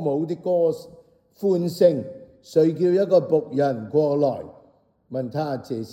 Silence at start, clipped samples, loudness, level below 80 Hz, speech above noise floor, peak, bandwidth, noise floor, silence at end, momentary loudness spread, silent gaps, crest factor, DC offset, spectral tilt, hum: 0 s; under 0.1%; -22 LUFS; -68 dBFS; 37 dB; -4 dBFS; 16.5 kHz; -58 dBFS; 0 s; 13 LU; none; 18 dB; under 0.1%; -8 dB/octave; none